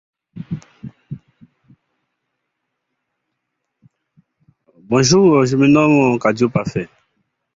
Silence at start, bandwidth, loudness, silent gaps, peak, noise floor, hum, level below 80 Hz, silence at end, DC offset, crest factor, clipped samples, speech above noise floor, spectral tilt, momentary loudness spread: 0.35 s; 7.8 kHz; -14 LUFS; none; -2 dBFS; -76 dBFS; none; -54 dBFS; 0.7 s; under 0.1%; 16 dB; under 0.1%; 62 dB; -5.5 dB/octave; 24 LU